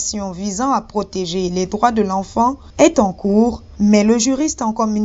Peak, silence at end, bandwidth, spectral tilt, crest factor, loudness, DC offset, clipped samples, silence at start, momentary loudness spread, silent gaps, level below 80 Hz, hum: 0 dBFS; 0 s; 8 kHz; -5 dB/octave; 16 dB; -17 LUFS; under 0.1%; under 0.1%; 0 s; 9 LU; none; -40 dBFS; none